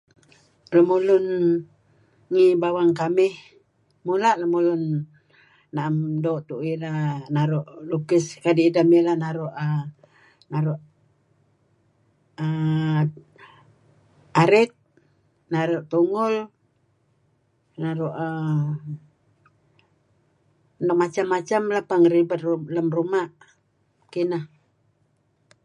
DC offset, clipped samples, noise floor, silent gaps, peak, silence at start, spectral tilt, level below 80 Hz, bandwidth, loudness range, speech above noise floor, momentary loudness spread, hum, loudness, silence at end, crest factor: under 0.1%; under 0.1%; -67 dBFS; none; -4 dBFS; 0.7 s; -7.5 dB/octave; -72 dBFS; 10.5 kHz; 8 LU; 45 dB; 12 LU; none; -22 LUFS; 1.2 s; 20 dB